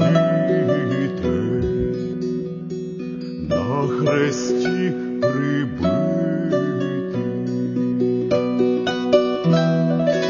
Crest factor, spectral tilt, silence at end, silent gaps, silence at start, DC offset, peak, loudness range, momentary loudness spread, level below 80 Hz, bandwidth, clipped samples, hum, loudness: 18 dB; -7 dB/octave; 0 s; none; 0 s; under 0.1%; -2 dBFS; 3 LU; 7 LU; -46 dBFS; 7.4 kHz; under 0.1%; none; -21 LUFS